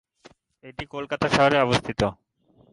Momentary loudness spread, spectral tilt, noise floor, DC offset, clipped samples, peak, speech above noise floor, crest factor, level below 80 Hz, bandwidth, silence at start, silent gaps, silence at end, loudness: 18 LU; -5 dB/octave; -60 dBFS; under 0.1%; under 0.1%; -6 dBFS; 37 dB; 18 dB; -50 dBFS; 11.5 kHz; 0.65 s; none; 0.6 s; -23 LUFS